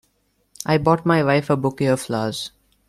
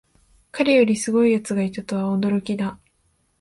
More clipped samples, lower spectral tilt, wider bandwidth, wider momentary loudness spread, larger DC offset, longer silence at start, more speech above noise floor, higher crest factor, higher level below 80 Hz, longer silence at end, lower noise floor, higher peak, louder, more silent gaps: neither; about the same, -6 dB/octave vs -5.5 dB/octave; first, 14 kHz vs 11.5 kHz; about the same, 12 LU vs 10 LU; neither; about the same, 0.6 s vs 0.55 s; about the same, 47 dB vs 46 dB; about the same, 18 dB vs 18 dB; first, -52 dBFS vs -58 dBFS; second, 0.4 s vs 0.65 s; about the same, -66 dBFS vs -66 dBFS; about the same, -2 dBFS vs -4 dBFS; about the same, -20 LUFS vs -21 LUFS; neither